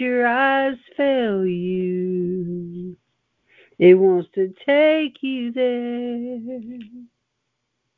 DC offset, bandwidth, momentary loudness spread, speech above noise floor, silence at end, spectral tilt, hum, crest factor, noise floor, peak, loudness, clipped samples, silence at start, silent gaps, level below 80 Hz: under 0.1%; 4.3 kHz; 17 LU; 57 dB; 0.9 s; -9.5 dB/octave; none; 20 dB; -76 dBFS; -2 dBFS; -20 LUFS; under 0.1%; 0 s; none; -66 dBFS